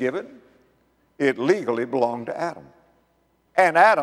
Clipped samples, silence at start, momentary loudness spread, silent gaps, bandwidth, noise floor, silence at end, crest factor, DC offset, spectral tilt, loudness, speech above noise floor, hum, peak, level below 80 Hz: under 0.1%; 0 s; 16 LU; none; 13 kHz; -65 dBFS; 0 s; 20 dB; under 0.1%; -5.5 dB/octave; -22 LUFS; 44 dB; none; -2 dBFS; -72 dBFS